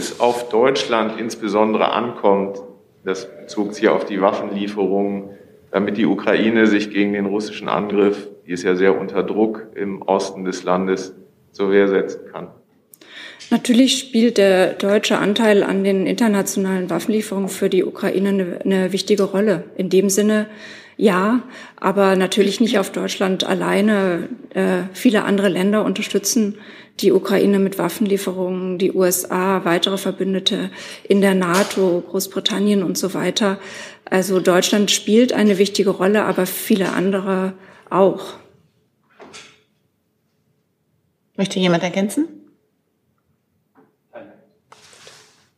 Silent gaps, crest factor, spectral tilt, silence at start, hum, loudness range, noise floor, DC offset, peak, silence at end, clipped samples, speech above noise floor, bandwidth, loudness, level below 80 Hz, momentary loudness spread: none; 18 dB; -4.5 dB/octave; 0 s; none; 7 LU; -67 dBFS; under 0.1%; -2 dBFS; 1.3 s; under 0.1%; 49 dB; 15.5 kHz; -18 LUFS; -70 dBFS; 11 LU